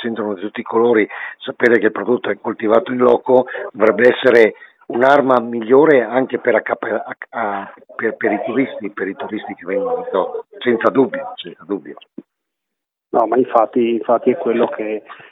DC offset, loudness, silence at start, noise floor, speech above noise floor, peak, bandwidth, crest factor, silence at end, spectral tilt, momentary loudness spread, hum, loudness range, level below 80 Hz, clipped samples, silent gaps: under 0.1%; -16 LUFS; 0 s; -80 dBFS; 64 dB; 0 dBFS; 6.8 kHz; 16 dB; 0.15 s; -7 dB/octave; 14 LU; none; 8 LU; -68 dBFS; under 0.1%; none